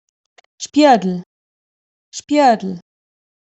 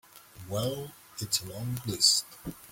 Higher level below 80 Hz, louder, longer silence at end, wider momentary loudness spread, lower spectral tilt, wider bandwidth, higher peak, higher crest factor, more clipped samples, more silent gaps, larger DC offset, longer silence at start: second, -68 dBFS vs -60 dBFS; first, -15 LUFS vs -28 LUFS; first, 0.65 s vs 0 s; about the same, 21 LU vs 20 LU; first, -5 dB/octave vs -2.5 dB/octave; second, 8.2 kHz vs 17 kHz; first, -2 dBFS vs -10 dBFS; second, 16 dB vs 22 dB; neither; first, 1.26-2.12 s vs none; neither; first, 0.6 s vs 0.15 s